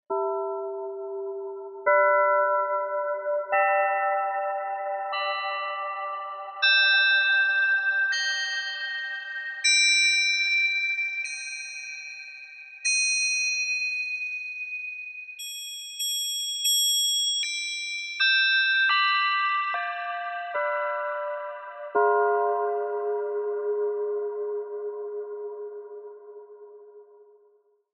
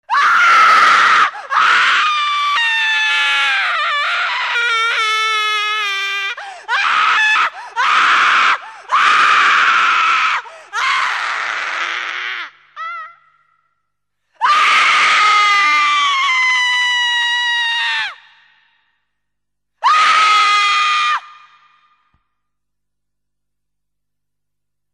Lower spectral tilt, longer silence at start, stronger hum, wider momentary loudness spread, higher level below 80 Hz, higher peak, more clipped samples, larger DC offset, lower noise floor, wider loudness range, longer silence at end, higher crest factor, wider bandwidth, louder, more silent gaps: about the same, 3 dB/octave vs 2 dB/octave; about the same, 0.1 s vs 0.1 s; second, none vs 50 Hz at -75 dBFS; first, 15 LU vs 10 LU; second, -88 dBFS vs -72 dBFS; second, -8 dBFS vs 0 dBFS; neither; neither; second, -63 dBFS vs -81 dBFS; about the same, 7 LU vs 8 LU; second, 0.7 s vs 3.65 s; about the same, 18 dB vs 14 dB; second, 11.5 kHz vs 13.5 kHz; second, -24 LUFS vs -12 LUFS; neither